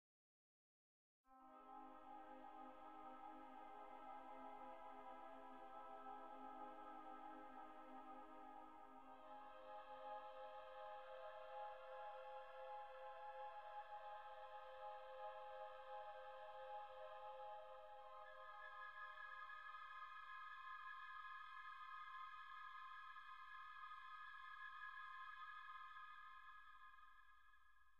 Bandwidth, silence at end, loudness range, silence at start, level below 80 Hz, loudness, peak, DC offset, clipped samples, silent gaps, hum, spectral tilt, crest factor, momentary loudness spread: 6.8 kHz; 0 s; 3 LU; 1.25 s; -86 dBFS; -58 LUFS; -44 dBFS; under 0.1%; under 0.1%; none; none; 0 dB/octave; 14 dB; 5 LU